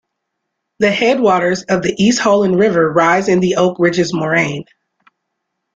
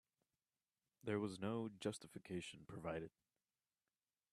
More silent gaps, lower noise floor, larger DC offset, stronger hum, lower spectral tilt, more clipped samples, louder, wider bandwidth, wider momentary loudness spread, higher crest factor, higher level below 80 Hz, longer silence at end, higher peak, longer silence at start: neither; second, -75 dBFS vs under -90 dBFS; neither; neither; about the same, -5 dB/octave vs -5.5 dB/octave; neither; first, -14 LUFS vs -48 LUFS; second, 9.4 kHz vs 13 kHz; second, 5 LU vs 9 LU; second, 14 dB vs 22 dB; first, -52 dBFS vs -80 dBFS; about the same, 1.15 s vs 1.25 s; first, -2 dBFS vs -28 dBFS; second, 0.8 s vs 1.05 s